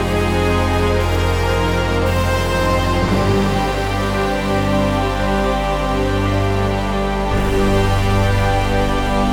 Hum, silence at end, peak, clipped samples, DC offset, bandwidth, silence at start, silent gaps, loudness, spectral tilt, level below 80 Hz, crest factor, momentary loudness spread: none; 0 s; -4 dBFS; under 0.1%; under 0.1%; 17.5 kHz; 0 s; none; -17 LUFS; -6 dB/octave; -24 dBFS; 12 dB; 3 LU